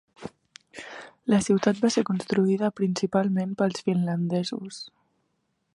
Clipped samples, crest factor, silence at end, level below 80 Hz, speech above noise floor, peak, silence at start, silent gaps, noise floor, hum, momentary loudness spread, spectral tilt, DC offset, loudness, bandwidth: under 0.1%; 18 dB; 0.9 s; -66 dBFS; 50 dB; -8 dBFS; 0.2 s; none; -74 dBFS; none; 20 LU; -6 dB/octave; under 0.1%; -25 LUFS; 11 kHz